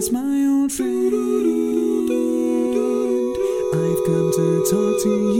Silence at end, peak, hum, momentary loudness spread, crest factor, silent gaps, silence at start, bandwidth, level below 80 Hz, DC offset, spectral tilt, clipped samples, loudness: 0 s; -6 dBFS; none; 3 LU; 12 dB; none; 0 s; 17 kHz; -52 dBFS; under 0.1%; -6 dB/octave; under 0.1%; -20 LUFS